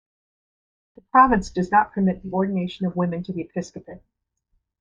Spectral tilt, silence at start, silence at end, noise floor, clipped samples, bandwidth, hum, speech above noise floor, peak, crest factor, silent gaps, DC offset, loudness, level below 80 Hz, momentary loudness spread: -7 dB/octave; 1.15 s; 0.85 s; -71 dBFS; under 0.1%; 7.8 kHz; none; 50 dB; -2 dBFS; 22 dB; none; under 0.1%; -22 LUFS; -48 dBFS; 15 LU